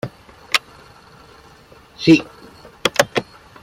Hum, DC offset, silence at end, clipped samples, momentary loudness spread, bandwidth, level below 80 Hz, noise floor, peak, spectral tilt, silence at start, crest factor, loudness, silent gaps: none; under 0.1%; 0.4 s; under 0.1%; 13 LU; 16.5 kHz; -54 dBFS; -46 dBFS; 0 dBFS; -4 dB/octave; 0.05 s; 20 dB; -18 LUFS; none